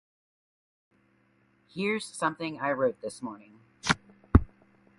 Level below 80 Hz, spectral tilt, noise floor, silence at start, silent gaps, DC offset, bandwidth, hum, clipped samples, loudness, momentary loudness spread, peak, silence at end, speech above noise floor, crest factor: -38 dBFS; -5.5 dB/octave; -67 dBFS; 1.75 s; none; under 0.1%; 11.5 kHz; none; under 0.1%; -30 LUFS; 16 LU; -4 dBFS; 0.55 s; 35 dB; 28 dB